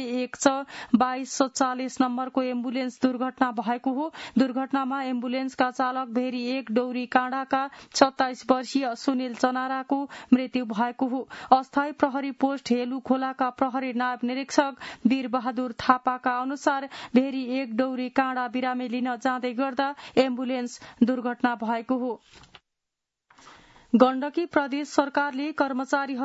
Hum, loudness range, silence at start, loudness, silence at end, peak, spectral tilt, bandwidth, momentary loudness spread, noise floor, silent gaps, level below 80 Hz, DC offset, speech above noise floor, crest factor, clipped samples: none; 2 LU; 0 s; -26 LUFS; 0 s; -2 dBFS; -4 dB/octave; 8 kHz; 6 LU; -85 dBFS; none; -68 dBFS; under 0.1%; 59 dB; 24 dB; under 0.1%